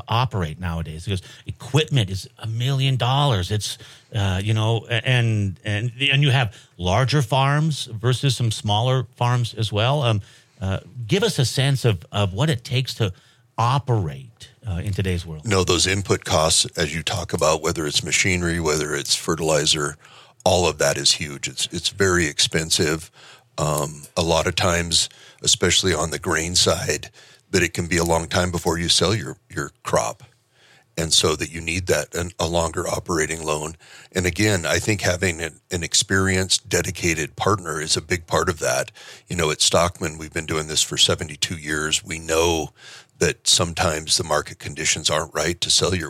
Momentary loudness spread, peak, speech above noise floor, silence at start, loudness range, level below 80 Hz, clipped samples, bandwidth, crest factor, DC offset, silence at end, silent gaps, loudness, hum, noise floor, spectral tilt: 11 LU; -2 dBFS; 34 dB; 0.1 s; 3 LU; -44 dBFS; under 0.1%; 16 kHz; 20 dB; under 0.1%; 0 s; none; -21 LUFS; none; -55 dBFS; -3.5 dB/octave